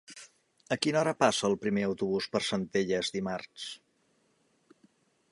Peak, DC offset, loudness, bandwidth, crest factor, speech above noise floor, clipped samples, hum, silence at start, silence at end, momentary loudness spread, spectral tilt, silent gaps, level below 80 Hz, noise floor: -8 dBFS; under 0.1%; -30 LUFS; 11.5 kHz; 24 dB; 41 dB; under 0.1%; none; 0.1 s; 1.55 s; 15 LU; -4.5 dB/octave; none; -68 dBFS; -71 dBFS